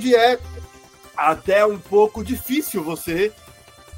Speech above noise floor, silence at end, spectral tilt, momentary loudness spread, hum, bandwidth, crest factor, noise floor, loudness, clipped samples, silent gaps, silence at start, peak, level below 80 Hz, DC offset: 27 dB; 0 s; -4.5 dB/octave; 11 LU; none; 16.5 kHz; 18 dB; -46 dBFS; -20 LUFS; under 0.1%; none; 0 s; -2 dBFS; -46 dBFS; under 0.1%